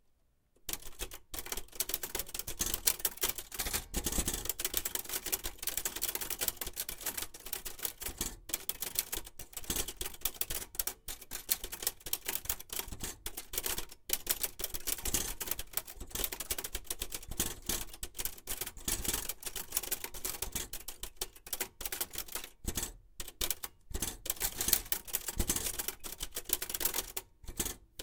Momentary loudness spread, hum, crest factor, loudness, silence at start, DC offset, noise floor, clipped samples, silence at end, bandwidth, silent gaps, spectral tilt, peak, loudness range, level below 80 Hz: 9 LU; none; 32 dB; -36 LUFS; 0.65 s; under 0.1%; -71 dBFS; under 0.1%; 0 s; 19 kHz; none; -1 dB/octave; -6 dBFS; 4 LU; -50 dBFS